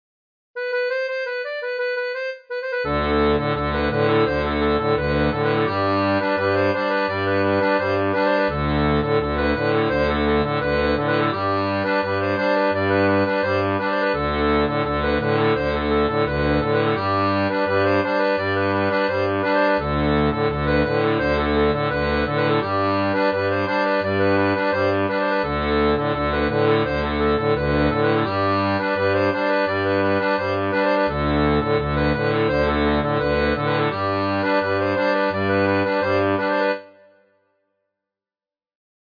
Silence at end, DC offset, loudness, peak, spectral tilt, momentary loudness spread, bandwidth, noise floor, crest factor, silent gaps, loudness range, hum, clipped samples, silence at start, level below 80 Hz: 2.25 s; under 0.1%; -20 LUFS; -6 dBFS; -8 dB/octave; 3 LU; 5.2 kHz; under -90 dBFS; 14 dB; none; 1 LU; none; under 0.1%; 0.55 s; -36 dBFS